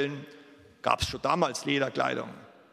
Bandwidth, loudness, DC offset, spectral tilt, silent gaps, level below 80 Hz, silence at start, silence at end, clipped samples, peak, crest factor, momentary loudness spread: 16 kHz; -29 LUFS; under 0.1%; -4 dB/octave; none; -52 dBFS; 0 s; 0.2 s; under 0.1%; -6 dBFS; 24 dB; 16 LU